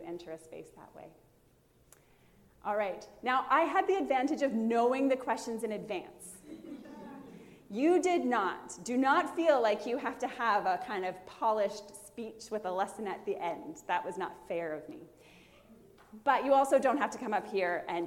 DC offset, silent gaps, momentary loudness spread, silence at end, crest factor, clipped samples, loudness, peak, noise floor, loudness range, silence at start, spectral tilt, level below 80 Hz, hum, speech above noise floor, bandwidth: under 0.1%; none; 20 LU; 0 s; 18 dB; under 0.1%; -32 LUFS; -14 dBFS; -66 dBFS; 7 LU; 0 s; -4.5 dB/octave; -72 dBFS; none; 34 dB; 16.5 kHz